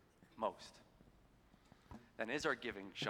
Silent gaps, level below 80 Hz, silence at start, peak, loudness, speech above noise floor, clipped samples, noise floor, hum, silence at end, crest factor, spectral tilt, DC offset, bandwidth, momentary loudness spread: none; -72 dBFS; 0.2 s; -22 dBFS; -43 LUFS; 25 dB; under 0.1%; -69 dBFS; none; 0 s; 24 dB; -4 dB/octave; under 0.1%; 18 kHz; 22 LU